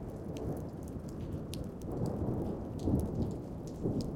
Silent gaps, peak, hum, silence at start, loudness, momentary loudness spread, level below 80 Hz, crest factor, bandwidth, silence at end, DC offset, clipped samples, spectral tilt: none; -18 dBFS; none; 0 s; -38 LUFS; 9 LU; -48 dBFS; 20 dB; 17 kHz; 0 s; under 0.1%; under 0.1%; -8 dB/octave